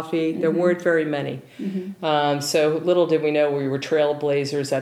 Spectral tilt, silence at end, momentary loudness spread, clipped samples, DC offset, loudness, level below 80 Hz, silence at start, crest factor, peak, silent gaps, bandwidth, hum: -5.5 dB/octave; 0 s; 9 LU; under 0.1%; under 0.1%; -22 LUFS; -74 dBFS; 0 s; 14 dB; -8 dBFS; none; 15.5 kHz; none